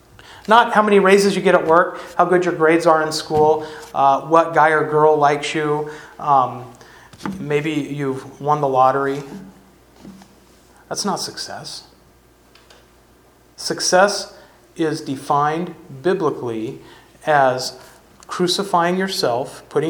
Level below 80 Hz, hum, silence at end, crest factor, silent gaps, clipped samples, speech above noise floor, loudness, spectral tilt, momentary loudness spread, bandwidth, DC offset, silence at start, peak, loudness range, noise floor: -56 dBFS; none; 0 s; 18 dB; none; under 0.1%; 34 dB; -18 LUFS; -4.5 dB/octave; 15 LU; 19.5 kHz; under 0.1%; 0.3 s; 0 dBFS; 13 LU; -51 dBFS